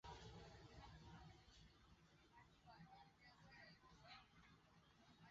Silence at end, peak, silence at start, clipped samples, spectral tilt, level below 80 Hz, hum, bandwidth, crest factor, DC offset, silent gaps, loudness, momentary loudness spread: 0 s; -48 dBFS; 0.05 s; under 0.1%; -3.5 dB/octave; -74 dBFS; none; 7.6 kHz; 18 dB; under 0.1%; none; -65 LUFS; 7 LU